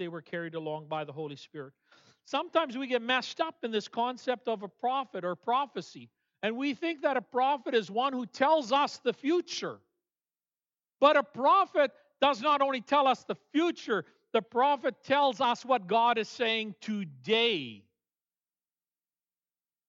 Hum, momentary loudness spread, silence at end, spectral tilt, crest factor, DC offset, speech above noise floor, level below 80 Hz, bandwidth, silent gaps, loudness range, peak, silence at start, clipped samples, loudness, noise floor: none; 12 LU; 2.1 s; -4 dB/octave; 22 dB; under 0.1%; over 60 dB; under -90 dBFS; 7.8 kHz; none; 6 LU; -10 dBFS; 0 s; under 0.1%; -30 LUFS; under -90 dBFS